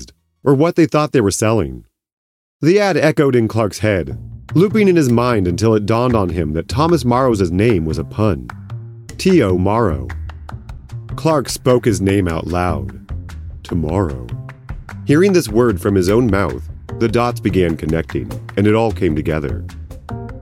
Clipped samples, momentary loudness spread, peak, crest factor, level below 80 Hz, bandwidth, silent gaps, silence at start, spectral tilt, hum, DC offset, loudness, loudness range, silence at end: under 0.1%; 17 LU; -2 dBFS; 14 dB; -34 dBFS; 16 kHz; 2.13-2.60 s; 0 s; -6.5 dB/octave; none; under 0.1%; -16 LUFS; 4 LU; 0 s